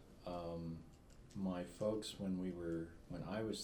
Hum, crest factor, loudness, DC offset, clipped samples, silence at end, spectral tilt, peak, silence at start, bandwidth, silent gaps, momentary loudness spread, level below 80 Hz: none; 16 dB; -45 LUFS; under 0.1%; under 0.1%; 0 s; -6 dB/octave; -28 dBFS; 0 s; 19.5 kHz; none; 12 LU; -64 dBFS